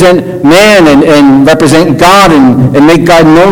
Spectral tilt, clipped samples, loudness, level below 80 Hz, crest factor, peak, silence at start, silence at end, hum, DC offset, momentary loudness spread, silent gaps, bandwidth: -5.5 dB/octave; 40%; -3 LUFS; -30 dBFS; 2 dB; 0 dBFS; 0 s; 0 s; none; under 0.1%; 3 LU; none; over 20 kHz